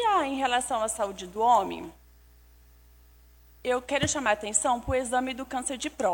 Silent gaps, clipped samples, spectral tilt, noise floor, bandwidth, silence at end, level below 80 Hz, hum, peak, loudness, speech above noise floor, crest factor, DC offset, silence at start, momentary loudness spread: none; under 0.1%; -2.5 dB/octave; -55 dBFS; 17 kHz; 0 s; -52 dBFS; 60 Hz at -55 dBFS; -8 dBFS; -27 LUFS; 28 dB; 22 dB; under 0.1%; 0 s; 9 LU